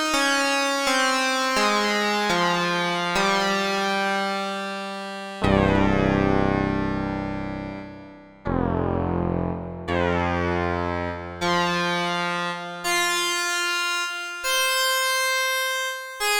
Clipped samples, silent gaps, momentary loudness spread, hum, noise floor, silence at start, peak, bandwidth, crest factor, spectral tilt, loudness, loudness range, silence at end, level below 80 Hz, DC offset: under 0.1%; none; 9 LU; none; -44 dBFS; 0 s; -2 dBFS; over 20 kHz; 20 dB; -3.5 dB/octave; -23 LUFS; 5 LU; 0 s; -42 dBFS; under 0.1%